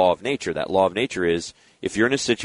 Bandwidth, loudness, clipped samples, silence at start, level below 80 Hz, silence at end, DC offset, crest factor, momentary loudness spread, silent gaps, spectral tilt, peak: 11 kHz; -23 LUFS; under 0.1%; 0 s; -54 dBFS; 0 s; under 0.1%; 18 dB; 8 LU; none; -4 dB/octave; -6 dBFS